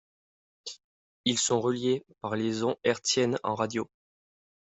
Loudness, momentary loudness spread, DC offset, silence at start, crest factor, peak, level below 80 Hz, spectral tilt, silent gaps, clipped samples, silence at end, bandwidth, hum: -29 LUFS; 17 LU; under 0.1%; 0.65 s; 20 dB; -10 dBFS; -72 dBFS; -3.5 dB/octave; 0.84-1.24 s; under 0.1%; 0.85 s; 8.2 kHz; none